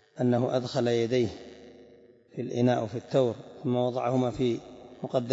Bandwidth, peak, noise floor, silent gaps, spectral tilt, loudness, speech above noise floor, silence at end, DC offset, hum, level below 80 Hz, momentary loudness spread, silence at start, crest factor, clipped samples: 7.8 kHz; -10 dBFS; -56 dBFS; none; -7 dB/octave; -28 LUFS; 28 dB; 0 s; under 0.1%; none; -62 dBFS; 14 LU; 0.15 s; 18 dB; under 0.1%